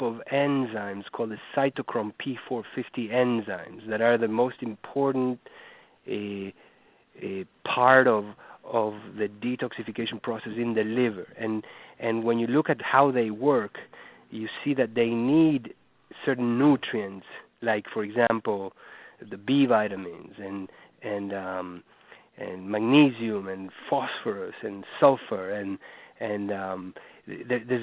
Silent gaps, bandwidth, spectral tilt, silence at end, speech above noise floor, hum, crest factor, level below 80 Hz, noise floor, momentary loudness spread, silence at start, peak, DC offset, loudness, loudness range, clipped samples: none; 4 kHz; -10 dB/octave; 0 s; 32 dB; none; 24 dB; -70 dBFS; -59 dBFS; 18 LU; 0 s; -4 dBFS; under 0.1%; -27 LUFS; 4 LU; under 0.1%